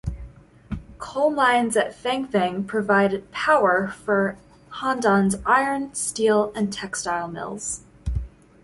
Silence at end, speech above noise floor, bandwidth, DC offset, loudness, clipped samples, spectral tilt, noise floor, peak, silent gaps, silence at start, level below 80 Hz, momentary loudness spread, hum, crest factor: 0.35 s; 22 dB; 11.5 kHz; under 0.1%; -22 LUFS; under 0.1%; -4.5 dB/octave; -44 dBFS; -6 dBFS; none; 0.05 s; -42 dBFS; 14 LU; none; 18 dB